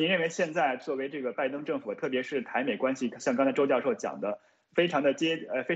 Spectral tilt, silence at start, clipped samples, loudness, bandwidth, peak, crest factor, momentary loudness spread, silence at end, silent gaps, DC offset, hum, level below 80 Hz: -4.5 dB/octave; 0 s; under 0.1%; -30 LUFS; 8.2 kHz; -12 dBFS; 16 dB; 7 LU; 0 s; none; under 0.1%; none; -76 dBFS